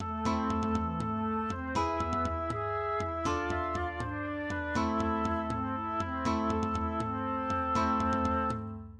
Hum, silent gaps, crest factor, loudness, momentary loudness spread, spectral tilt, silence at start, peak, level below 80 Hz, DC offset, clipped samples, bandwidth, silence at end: none; none; 14 dB; -32 LUFS; 5 LU; -6.5 dB/octave; 0 s; -18 dBFS; -46 dBFS; under 0.1%; under 0.1%; 10.5 kHz; 0 s